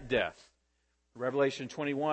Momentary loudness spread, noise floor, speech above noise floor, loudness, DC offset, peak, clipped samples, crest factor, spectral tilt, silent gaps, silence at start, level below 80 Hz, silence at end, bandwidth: 7 LU; -76 dBFS; 45 dB; -33 LUFS; under 0.1%; -16 dBFS; under 0.1%; 18 dB; -5.5 dB/octave; none; 0 s; -62 dBFS; 0 s; 8.6 kHz